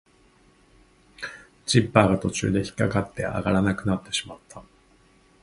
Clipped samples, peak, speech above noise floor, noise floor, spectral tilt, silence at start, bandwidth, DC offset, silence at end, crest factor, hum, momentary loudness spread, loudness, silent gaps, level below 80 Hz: under 0.1%; 0 dBFS; 35 dB; -58 dBFS; -5.5 dB/octave; 1.2 s; 11.5 kHz; under 0.1%; 0.8 s; 26 dB; none; 18 LU; -24 LUFS; none; -48 dBFS